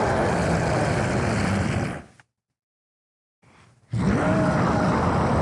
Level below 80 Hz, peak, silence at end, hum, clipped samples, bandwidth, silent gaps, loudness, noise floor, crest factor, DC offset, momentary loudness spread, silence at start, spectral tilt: -40 dBFS; -8 dBFS; 0 s; none; under 0.1%; 11.5 kHz; 2.63-3.42 s; -23 LUFS; -58 dBFS; 16 dB; under 0.1%; 6 LU; 0 s; -6.5 dB/octave